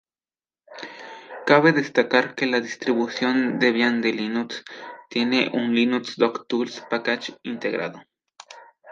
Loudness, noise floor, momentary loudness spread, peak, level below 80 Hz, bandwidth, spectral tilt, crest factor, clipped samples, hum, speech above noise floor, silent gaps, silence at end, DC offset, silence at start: -22 LUFS; under -90 dBFS; 17 LU; 0 dBFS; -74 dBFS; 7.6 kHz; -5 dB/octave; 22 dB; under 0.1%; none; over 68 dB; none; 0 s; under 0.1%; 0.7 s